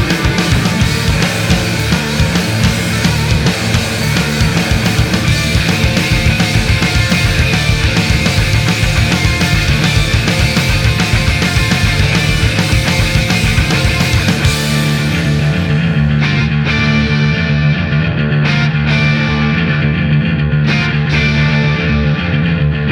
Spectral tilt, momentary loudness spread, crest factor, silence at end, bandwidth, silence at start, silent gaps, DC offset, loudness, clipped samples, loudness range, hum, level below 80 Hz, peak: -5 dB/octave; 2 LU; 12 dB; 0 s; 18 kHz; 0 s; none; under 0.1%; -12 LUFS; under 0.1%; 1 LU; none; -22 dBFS; 0 dBFS